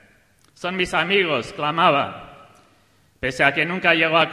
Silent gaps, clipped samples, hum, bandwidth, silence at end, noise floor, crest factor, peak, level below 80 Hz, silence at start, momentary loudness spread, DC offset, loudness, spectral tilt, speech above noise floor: none; under 0.1%; none; 15.5 kHz; 0 s; -59 dBFS; 20 dB; -2 dBFS; -54 dBFS; 0.6 s; 12 LU; under 0.1%; -20 LUFS; -4.5 dB/octave; 39 dB